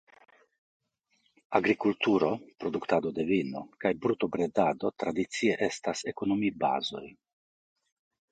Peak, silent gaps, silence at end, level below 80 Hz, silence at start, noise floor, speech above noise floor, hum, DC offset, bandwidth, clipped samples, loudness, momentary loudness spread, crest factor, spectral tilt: -8 dBFS; none; 1.2 s; -66 dBFS; 1.5 s; -74 dBFS; 44 dB; none; under 0.1%; 9.4 kHz; under 0.1%; -30 LUFS; 8 LU; 22 dB; -5 dB/octave